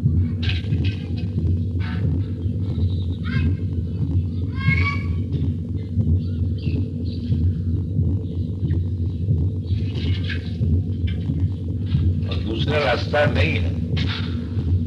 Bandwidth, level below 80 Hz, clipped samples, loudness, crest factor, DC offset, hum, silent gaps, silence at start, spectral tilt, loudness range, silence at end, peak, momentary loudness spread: 6 kHz; -32 dBFS; under 0.1%; -23 LUFS; 16 dB; under 0.1%; none; none; 0 s; -8.5 dB/octave; 2 LU; 0 s; -6 dBFS; 5 LU